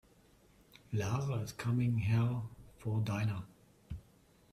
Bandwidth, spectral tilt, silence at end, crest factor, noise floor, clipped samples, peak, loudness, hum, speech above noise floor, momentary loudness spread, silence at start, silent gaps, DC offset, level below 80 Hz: 13.5 kHz; -7 dB/octave; 0.55 s; 16 dB; -65 dBFS; under 0.1%; -22 dBFS; -36 LUFS; none; 32 dB; 18 LU; 0.9 s; none; under 0.1%; -60 dBFS